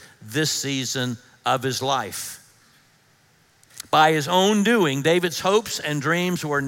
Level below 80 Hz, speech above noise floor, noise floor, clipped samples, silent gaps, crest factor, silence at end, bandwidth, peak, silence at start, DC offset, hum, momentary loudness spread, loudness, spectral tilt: -66 dBFS; 37 dB; -59 dBFS; under 0.1%; none; 20 dB; 0 s; 17 kHz; -4 dBFS; 0 s; under 0.1%; none; 11 LU; -21 LUFS; -4 dB/octave